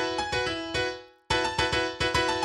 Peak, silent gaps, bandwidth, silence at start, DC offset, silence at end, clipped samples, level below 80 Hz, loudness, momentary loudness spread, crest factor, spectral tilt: -10 dBFS; none; 13 kHz; 0 s; under 0.1%; 0 s; under 0.1%; -46 dBFS; -27 LUFS; 5 LU; 18 dB; -3.5 dB/octave